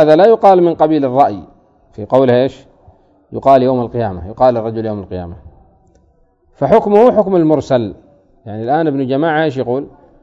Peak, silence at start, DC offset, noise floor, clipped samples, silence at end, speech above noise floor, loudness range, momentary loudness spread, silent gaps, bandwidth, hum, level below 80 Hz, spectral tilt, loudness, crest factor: 0 dBFS; 0 s; under 0.1%; -53 dBFS; 0.4%; 0.35 s; 41 dB; 3 LU; 17 LU; none; 7.8 kHz; none; -46 dBFS; -8.5 dB/octave; -13 LUFS; 14 dB